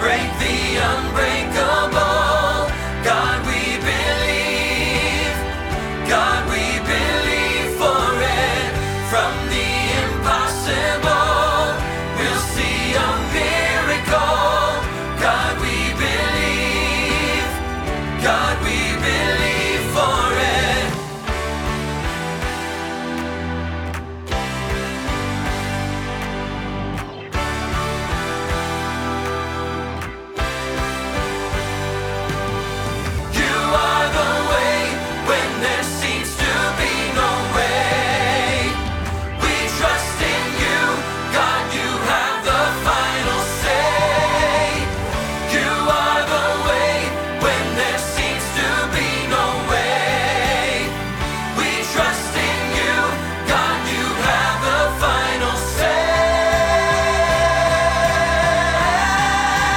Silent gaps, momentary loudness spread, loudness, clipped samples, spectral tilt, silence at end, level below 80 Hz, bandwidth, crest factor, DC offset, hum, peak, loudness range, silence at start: none; 7 LU; -19 LUFS; under 0.1%; -3.5 dB/octave; 0 s; -30 dBFS; 19.5 kHz; 16 dB; under 0.1%; none; -2 dBFS; 6 LU; 0 s